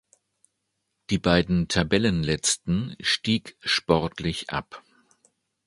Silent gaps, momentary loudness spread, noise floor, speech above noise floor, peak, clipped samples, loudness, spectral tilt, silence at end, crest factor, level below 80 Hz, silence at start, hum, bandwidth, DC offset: none; 8 LU; -78 dBFS; 54 dB; -4 dBFS; under 0.1%; -24 LUFS; -4 dB/octave; 0.9 s; 24 dB; -46 dBFS; 1.1 s; none; 11.5 kHz; under 0.1%